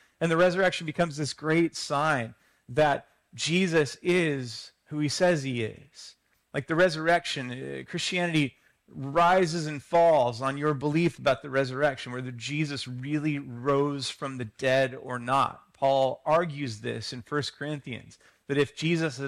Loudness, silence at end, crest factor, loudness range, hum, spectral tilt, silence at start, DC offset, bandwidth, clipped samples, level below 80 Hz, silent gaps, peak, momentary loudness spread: -27 LUFS; 0 s; 14 dB; 4 LU; none; -5 dB/octave; 0.2 s; under 0.1%; 13.5 kHz; under 0.1%; -62 dBFS; none; -14 dBFS; 12 LU